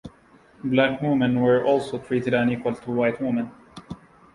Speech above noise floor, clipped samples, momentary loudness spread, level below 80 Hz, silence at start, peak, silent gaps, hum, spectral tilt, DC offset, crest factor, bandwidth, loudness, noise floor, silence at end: 32 dB; under 0.1%; 18 LU; -58 dBFS; 0.05 s; -6 dBFS; none; none; -7.5 dB/octave; under 0.1%; 18 dB; 11 kHz; -23 LUFS; -54 dBFS; 0.4 s